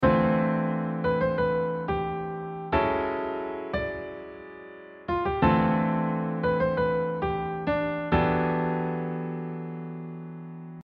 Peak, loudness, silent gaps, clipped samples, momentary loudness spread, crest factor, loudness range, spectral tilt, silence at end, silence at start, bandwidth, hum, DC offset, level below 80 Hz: -10 dBFS; -27 LUFS; none; under 0.1%; 16 LU; 18 dB; 4 LU; -10 dB/octave; 0 s; 0 s; 5.2 kHz; none; under 0.1%; -46 dBFS